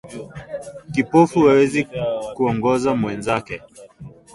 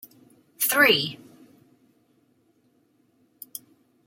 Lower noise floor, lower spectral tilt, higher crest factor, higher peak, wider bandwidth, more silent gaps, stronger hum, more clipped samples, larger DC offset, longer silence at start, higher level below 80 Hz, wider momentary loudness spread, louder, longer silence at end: second, -41 dBFS vs -65 dBFS; first, -6.5 dB/octave vs -2 dB/octave; second, 18 dB vs 24 dB; about the same, -2 dBFS vs -4 dBFS; second, 11.5 kHz vs 16.5 kHz; neither; neither; neither; neither; second, 0.05 s vs 0.6 s; first, -50 dBFS vs -74 dBFS; second, 19 LU vs 27 LU; about the same, -18 LUFS vs -20 LUFS; second, 0.25 s vs 2.9 s